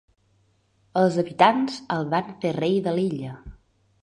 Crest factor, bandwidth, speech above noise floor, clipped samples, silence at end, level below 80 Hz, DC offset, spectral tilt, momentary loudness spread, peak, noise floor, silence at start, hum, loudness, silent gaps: 22 dB; 10.5 kHz; 42 dB; under 0.1%; 0.5 s; -56 dBFS; under 0.1%; -6.5 dB/octave; 12 LU; -2 dBFS; -65 dBFS; 0.95 s; none; -23 LUFS; none